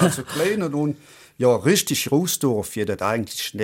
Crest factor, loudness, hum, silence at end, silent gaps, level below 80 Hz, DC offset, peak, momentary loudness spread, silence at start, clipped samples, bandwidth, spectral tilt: 18 dB; -22 LUFS; none; 0 s; none; -58 dBFS; under 0.1%; -4 dBFS; 8 LU; 0 s; under 0.1%; 17 kHz; -4.5 dB/octave